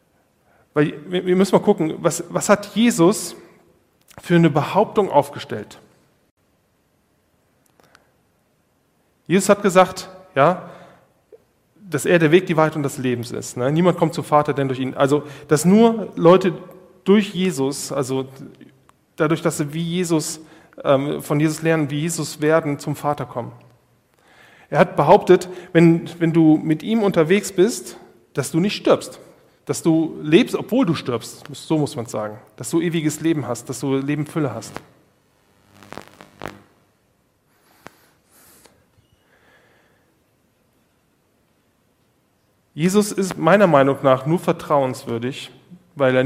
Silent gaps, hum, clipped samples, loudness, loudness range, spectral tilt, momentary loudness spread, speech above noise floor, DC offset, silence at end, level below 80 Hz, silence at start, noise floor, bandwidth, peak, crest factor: 6.31-6.37 s; none; under 0.1%; -19 LUFS; 7 LU; -6 dB/octave; 17 LU; 45 dB; under 0.1%; 0 s; -60 dBFS; 0.75 s; -63 dBFS; 16 kHz; 0 dBFS; 20 dB